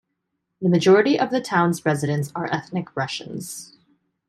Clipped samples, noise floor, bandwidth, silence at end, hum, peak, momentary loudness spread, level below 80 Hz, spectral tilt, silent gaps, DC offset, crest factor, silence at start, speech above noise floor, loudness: under 0.1%; -77 dBFS; 13.5 kHz; 0.65 s; none; -6 dBFS; 16 LU; -64 dBFS; -6 dB/octave; none; under 0.1%; 18 dB; 0.6 s; 56 dB; -21 LUFS